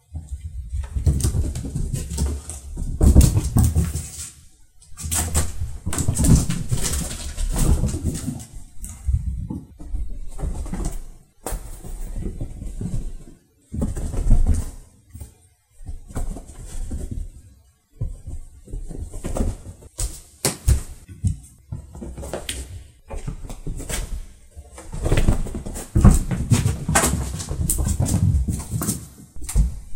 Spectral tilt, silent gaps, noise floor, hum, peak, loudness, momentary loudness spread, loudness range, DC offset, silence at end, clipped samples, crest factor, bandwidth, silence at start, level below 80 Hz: -5 dB/octave; none; -54 dBFS; none; 0 dBFS; -24 LUFS; 19 LU; 12 LU; under 0.1%; 0 s; under 0.1%; 22 dB; 16 kHz; 0.1 s; -26 dBFS